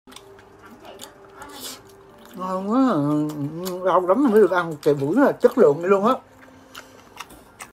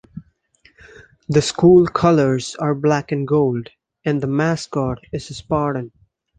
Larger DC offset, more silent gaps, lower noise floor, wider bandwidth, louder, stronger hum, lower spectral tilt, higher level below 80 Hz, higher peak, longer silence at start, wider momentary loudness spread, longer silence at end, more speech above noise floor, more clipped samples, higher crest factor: neither; neither; second, -47 dBFS vs -56 dBFS; first, 16 kHz vs 9.6 kHz; about the same, -20 LUFS vs -18 LUFS; neither; about the same, -6.5 dB/octave vs -6.5 dB/octave; second, -62 dBFS vs -48 dBFS; about the same, -2 dBFS vs -2 dBFS; first, 0.85 s vs 0.15 s; first, 24 LU vs 16 LU; second, 0.05 s vs 0.5 s; second, 28 dB vs 39 dB; neither; about the same, 20 dB vs 18 dB